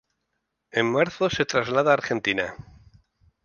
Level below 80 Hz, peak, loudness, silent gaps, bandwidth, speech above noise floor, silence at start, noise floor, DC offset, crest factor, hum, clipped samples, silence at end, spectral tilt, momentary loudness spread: -56 dBFS; -4 dBFS; -23 LUFS; none; 7.2 kHz; 55 dB; 0.75 s; -78 dBFS; under 0.1%; 22 dB; none; under 0.1%; 0.9 s; -4.5 dB/octave; 7 LU